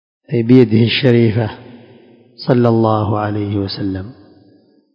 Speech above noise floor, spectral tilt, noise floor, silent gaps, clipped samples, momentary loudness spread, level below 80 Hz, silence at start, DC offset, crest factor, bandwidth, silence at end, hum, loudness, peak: 37 dB; -9.5 dB/octave; -51 dBFS; none; 0.2%; 14 LU; -44 dBFS; 0.3 s; under 0.1%; 16 dB; 5.4 kHz; 0.85 s; none; -14 LUFS; 0 dBFS